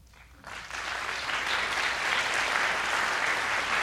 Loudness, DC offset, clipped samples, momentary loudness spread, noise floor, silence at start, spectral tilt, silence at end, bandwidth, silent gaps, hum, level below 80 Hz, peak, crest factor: -27 LUFS; under 0.1%; under 0.1%; 9 LU; -50 dBFS; 0.1 s; -0.5 dB/octave; 0 s; 16.5 kHz; none; none; -56 dBFS; -12 dBFS; 18 dB